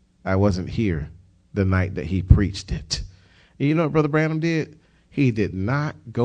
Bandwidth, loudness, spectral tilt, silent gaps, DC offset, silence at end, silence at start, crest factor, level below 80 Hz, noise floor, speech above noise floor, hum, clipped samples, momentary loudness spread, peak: 9.4 kHz; -23 LUFS; -7 dB/octave; none; under 0.1%; 0 s; 0.25 s; 22 dB; -32 dBFS; -52 dBFS; 31 dB; none; under 0.1%; 12 LU; 0 dBFS